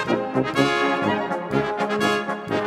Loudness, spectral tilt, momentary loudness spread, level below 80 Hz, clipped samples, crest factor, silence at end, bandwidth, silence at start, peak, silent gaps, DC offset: -22 LUFS; -5.5 dB/octave; 5 LU; -56 dBFS; under 0.1%; 16 dB; 0 s; 15.5 kHz; 0 s; -6 dBFS; none; under 0.1%